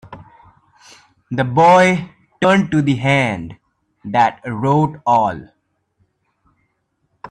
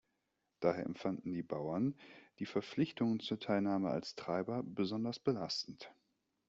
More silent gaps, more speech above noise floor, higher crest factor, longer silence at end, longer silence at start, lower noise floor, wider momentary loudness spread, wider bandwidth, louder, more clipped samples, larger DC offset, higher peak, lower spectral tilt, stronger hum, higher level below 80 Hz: neither; first, 53 dB vs 47 dB; second, 16 dB vs 22 dB; second, 0.05 s vs 0.55 s; second, 0.1 s vs 0.6 s; second, -67 dBFS vs -85 dBFS; first, 17 LU vs 9 LU; first, 10.5 kHz vs 8 kHz; first, -16 LUFS vs -39 LUFS; neither; neither; first, -2 dBFS vs -18 dBFS; about the same, -6.5 dB/octave vs -5.5 dB/octave; neither; first, -54 dBFS vs -76 dBFS